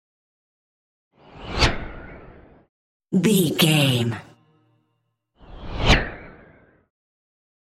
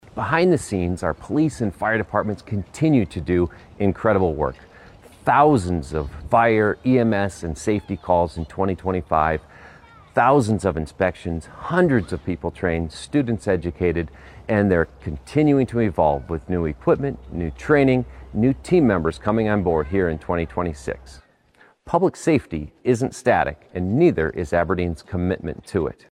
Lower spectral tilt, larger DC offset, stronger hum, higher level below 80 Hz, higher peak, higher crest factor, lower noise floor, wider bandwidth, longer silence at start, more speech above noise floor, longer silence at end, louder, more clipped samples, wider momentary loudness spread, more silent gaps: second, -4.5 dB/octave vs -7.5 dB/octave; neither; neither; about the same, -36 dBFS vs -40 dBFS; about the same, -2 dBFS vs -4 dBFS; first, 24 dB vs 16 dB; first, -73 dBFS vs -55 dBFS; first, 16 kHz vs 12.5 kHz; first, 1.35 s vs 0.15 s; first, 54 dB vs 35 dB; first, 1.5 s vs 0.2 s; about the same, -20 LUFS vs -21 LUFS; neither; first, 24 LU vs 10 LU; first, 2.69-3.00 s vs none